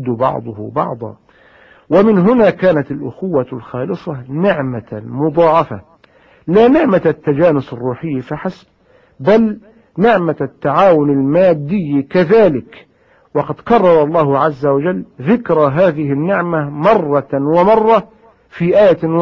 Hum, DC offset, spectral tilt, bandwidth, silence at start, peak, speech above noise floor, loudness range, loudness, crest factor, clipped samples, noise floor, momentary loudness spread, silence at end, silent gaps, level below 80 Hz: none; under 0.1%; -9.5 dB/octave; 6.6 kHz; 0 s; 0 dBFS; 35 dB; 3 LU; -13 LUFS; 14 dB; under 0.1%; -48 dBFS; 13 LU; 0 s; none; -48 dBFS